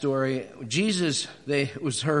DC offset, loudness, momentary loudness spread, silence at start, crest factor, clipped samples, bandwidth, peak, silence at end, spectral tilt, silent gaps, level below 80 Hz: under 0.1%; -27 LUFS; 5 LU; 0 s; 16 dB; under 0.1%; 11 kHz; -10 dBFS; 0 s; -4.5 dB/octave; none; -66 dBFS